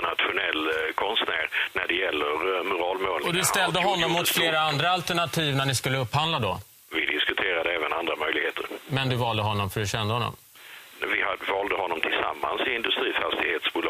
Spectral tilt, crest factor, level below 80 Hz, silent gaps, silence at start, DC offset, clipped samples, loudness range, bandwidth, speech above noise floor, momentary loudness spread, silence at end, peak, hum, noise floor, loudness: -3.5 dB/octave; 22 dB; -56 dBFS; none; 0 s; under 0.1%; under 0.1%; 4 LU; 16 kHz; 22 dB; 6 LU; 0 s; -4 dBFS; none; -47 dBFS; -25 LUFS